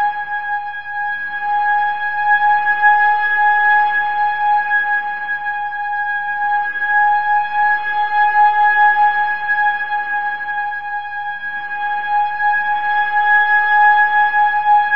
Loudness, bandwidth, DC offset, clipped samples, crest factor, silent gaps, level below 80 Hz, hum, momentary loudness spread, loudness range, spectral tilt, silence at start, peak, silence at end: -15 LUFS; 5.4 kHz; 2%; under 0.1%; 14 dB; none; -64 dBFS; none; 10 LU; 5 LU; -2.5 dB/octave; 0 s; -2 dBFS; 0 s